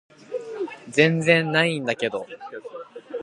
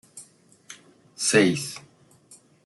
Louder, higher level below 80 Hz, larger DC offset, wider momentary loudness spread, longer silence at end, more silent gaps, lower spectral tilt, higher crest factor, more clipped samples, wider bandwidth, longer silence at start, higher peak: about the same, -22 LUFS vs -22 LUFS; about the same, -72 dBFS vs -70 dBFS; neither; second, 19 LU vs 26 LU; second, 0 s vs 0.85 s; neither; first, -5.5 dB/octave vs -3.5 dB/octave; about the same, 22 dB vs 24 dB; neither; about the same, 11.5 kHz vs 12.5 kHz; first, 0.3 s vs 0.15 s; about the same, -2 dBFS vs -4 dBFS